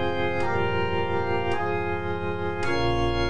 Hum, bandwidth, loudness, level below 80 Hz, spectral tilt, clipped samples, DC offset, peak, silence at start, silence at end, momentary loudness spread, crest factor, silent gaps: none; 10 kHz; -26 LUFS; -40 dBFS; -6.5 dB/octave; under 0.1%; 3%; -12 dBFS; 0 s; 0 s; 4 LU; 12 dB; none